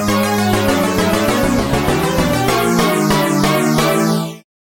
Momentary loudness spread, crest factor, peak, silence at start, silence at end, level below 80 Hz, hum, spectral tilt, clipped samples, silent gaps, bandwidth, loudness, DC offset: 2 LU; 12 dB; -2 dBFS; 0 s; 0.25 s; -32 dBFS; none; -5 dB/octave; under 0.1%; none; 17 kHz; -15 LUFS; under 0.1%